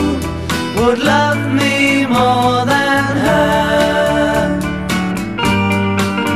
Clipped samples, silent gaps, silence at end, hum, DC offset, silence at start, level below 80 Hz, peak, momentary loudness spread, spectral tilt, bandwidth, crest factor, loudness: under 0.1%; none; 0 s; none; 0.7%; 0 s; -34 dBFS; 0 dBFS; 6 LU; -5 dB/octave; 15.5 kHz; 12 dB; -14 LUFS